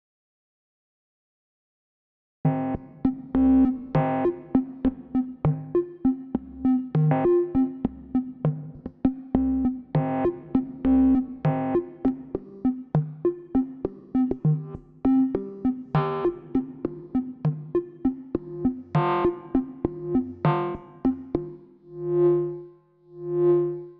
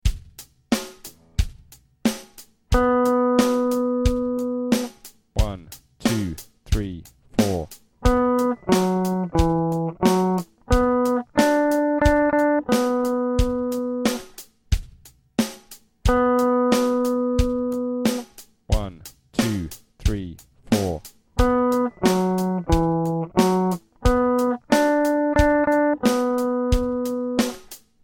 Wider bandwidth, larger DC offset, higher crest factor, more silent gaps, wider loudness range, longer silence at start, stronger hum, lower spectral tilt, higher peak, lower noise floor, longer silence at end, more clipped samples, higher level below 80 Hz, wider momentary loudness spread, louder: second, 4.3 kHz vs 17 kHz; neither; about the same, 20 dB vs 18 dB; neither; second, 3 LU vs 6 LU; first, 2.45 s vs 0.05 s; neither; first, -11.5 dB/octave vs -6 dB/octave; about the same, -6 dBFS vs -4 dBFS; about the same, -51 dBFS vs -50 dBFS; second, 0.05 s vs 0.3 s; neither; second, -48 dBFS vs -32 dBFS; about the same, 10 LU vs 12 LU; second, -26 LUFS vs -22 LUFS